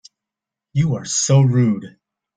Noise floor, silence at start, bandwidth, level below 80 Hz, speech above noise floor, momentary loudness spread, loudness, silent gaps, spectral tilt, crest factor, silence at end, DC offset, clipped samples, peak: -86 dBFS; 0.75 s; 9.4 kHz; -52 dBFS; 70 dB; 10 LU; -18 LUFS; none; -5.5 dB/octave; 16 dB; 0.5 s; under 0.1%; under 0.1%; -4 dBFS